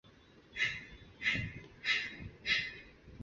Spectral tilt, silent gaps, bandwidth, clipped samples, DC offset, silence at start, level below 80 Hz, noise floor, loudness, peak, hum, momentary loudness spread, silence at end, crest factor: -0.5 dB/octave; none; 7.6 kHz; under 0.1%; under 0.1%; 0.05 s; -60 dBFS; -61 dBFS; -36 LUFS; -20 dBFS; none; 16 LU; 0 s; 20 dB